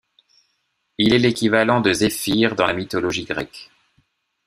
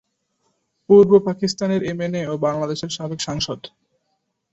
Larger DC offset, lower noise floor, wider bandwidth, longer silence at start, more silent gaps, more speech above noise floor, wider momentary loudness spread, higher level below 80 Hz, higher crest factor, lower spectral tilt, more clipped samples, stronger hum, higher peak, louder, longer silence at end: neither; about the same, -71 dBFS vs -72 dBFS; first, 15.5 kHz vs 8 kHz; about the same, 1 s vs 0.9 s; neither; about the same, 52 dB vs 54 dB; about the same, 12 LU vs 14 LU; about the same, -52 dBFS vs -54 dBFS; about the same, 20 dB vs 18 dB; about the same, -4.5 dB/octave vs -5.5 dB/octave; neither; neither; about the same, -2 dBFS vs -2 dBFS; about the same, -19 LUFS vs -19 LUFS; about the same, 0.8 s vs 0.85 s